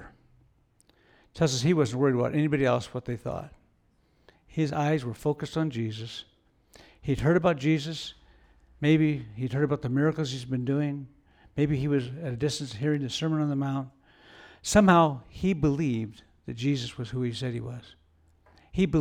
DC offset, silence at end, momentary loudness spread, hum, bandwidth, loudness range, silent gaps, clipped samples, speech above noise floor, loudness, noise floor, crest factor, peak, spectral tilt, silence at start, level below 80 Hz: under 0.1%; 0 s; 14 LU; none; 14 kHz; 6 LU; none; under 0.1%; 40 dB; -27 LUFS; -66 dBFS; 20 dB; -8 dBFS; -6 dB/octave; 0 s; -52 dBFS